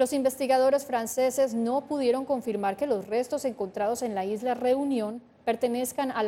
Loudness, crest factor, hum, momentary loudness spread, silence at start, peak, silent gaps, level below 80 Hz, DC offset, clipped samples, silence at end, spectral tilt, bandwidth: -28 LUFS; 16 dB; none; 6 LU; 0 s; -12 dBFS; none; -68 dBFS; under 0.1%; under 0.1%; 0 s; -4 dB/octave; 16.5 kHz